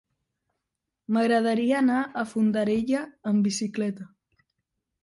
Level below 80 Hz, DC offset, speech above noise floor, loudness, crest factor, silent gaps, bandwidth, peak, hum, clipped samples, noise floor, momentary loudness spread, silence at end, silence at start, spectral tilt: -66 dBFS; under 0.1%; 60 dB; -25 LUFS; 14 dB; none; 11.5 kHz; -12 dBFS; none; under 0.1%; -84 dBFS; 8 LU; 0.95 s; 1.1 s; -5.5 dB/octave